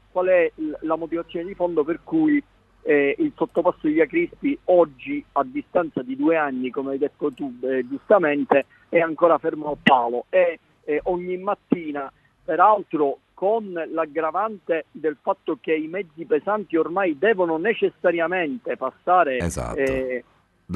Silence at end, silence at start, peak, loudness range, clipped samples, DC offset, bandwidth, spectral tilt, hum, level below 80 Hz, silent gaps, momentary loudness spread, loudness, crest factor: 0 s; 0.15 s; 0 dBFS; 4 LU; under 0.1%; under 0.1%; 12 kHz; -6 dB/octave; none; -52 dBFS; none; 9 LU; -22 LUFS; 22 dB